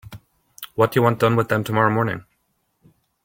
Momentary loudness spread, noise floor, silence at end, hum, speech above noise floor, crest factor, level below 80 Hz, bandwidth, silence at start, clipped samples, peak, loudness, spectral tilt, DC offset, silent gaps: 15 LU; -69 dBFS; 1.05 s; none; 51 dB; 20 dB; -56 dBFS; 17 kHz; 0.05 s; under 0.1%; -2 dBFS; -19 LUFS; -7 dB/octave; under 0.1%; none